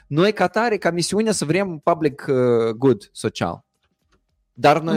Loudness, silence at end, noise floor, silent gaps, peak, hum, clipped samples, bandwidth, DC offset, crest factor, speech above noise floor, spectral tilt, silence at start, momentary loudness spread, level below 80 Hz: -20 LUFS; 0 s; -66 dBFS; none; -2 dBFS; none; under 0.1%; 16 kHz; under 0.1%; 18 dB; 47 dB; -5 dB/octave; 0.1 s; 7 LU; -58 dBFS